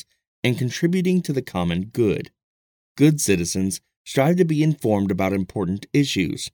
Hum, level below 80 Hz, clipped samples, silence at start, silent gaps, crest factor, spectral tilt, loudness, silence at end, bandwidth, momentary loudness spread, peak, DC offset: none; -52 dBFS; under 0.1%; 0.45 s; 2.43-2.95 s, 3.97-4.05 s; 18 dB; -5.5 dB/octave; -21 LUFS; 0.05 s; 19 kHz; 8 LU; -4 dBFS; under 0.1%